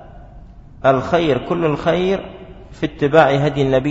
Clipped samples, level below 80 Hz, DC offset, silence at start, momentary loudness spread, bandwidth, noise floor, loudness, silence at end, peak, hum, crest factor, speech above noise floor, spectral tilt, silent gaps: under 0.1%; -40 dBFS; under 0.1%; 0 s; 13 LU; 8 kHz; -39 dBFS; -17 LUFS; 0 s; 0 dBFS; none; 18 dB; 23 dB; -7 dB/octave; none